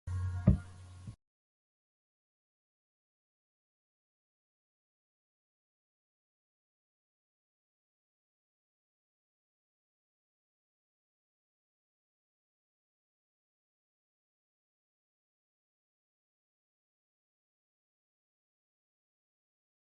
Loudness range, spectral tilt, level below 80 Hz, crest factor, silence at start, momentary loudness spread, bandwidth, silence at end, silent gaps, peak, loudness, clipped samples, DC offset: 22 LU; -9.5 dB/octave; -52 dBFS; 34 dB; 0.05 s; 22 LU; 11 kHz; 18.8 s; none; -12 dBFS; -33 LUFS; under 0.1%; under 0.1%